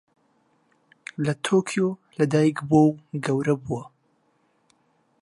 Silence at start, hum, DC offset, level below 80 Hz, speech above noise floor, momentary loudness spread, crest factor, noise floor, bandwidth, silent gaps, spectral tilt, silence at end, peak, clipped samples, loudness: 1.2 s; none; under 0.1%; -62 dBFS; 45 dB; 13 LU; 20 dB; -67 dBFS; 11.5 kHz; none; -6.5 dB/octave; 1.4 s; -6 dBFS; under 0.1%; -23 LUFS